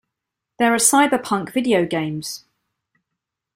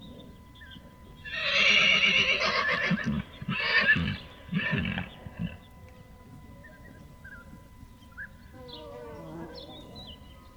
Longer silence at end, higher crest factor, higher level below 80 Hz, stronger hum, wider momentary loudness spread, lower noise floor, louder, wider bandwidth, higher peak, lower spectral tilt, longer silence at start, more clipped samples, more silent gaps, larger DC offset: first, 1.2 s vs 0.05 s; about the same, 20 dB vs 20 dB; second, -62 dBFS vs -52 dBFS; neither; second, 15 LU vs 26 LU; first, -82 dBFS vs -50 dBFS; first, -18 LUFS vs -25 LUFS; second, 16 kHz vs over 20 kHz; first, -2 dBFS vs -10 dBFS; about the same, -3 dB/octave vs -3.5 dB/octave; first, 0.6 s vs 0 s; neither; neither; neither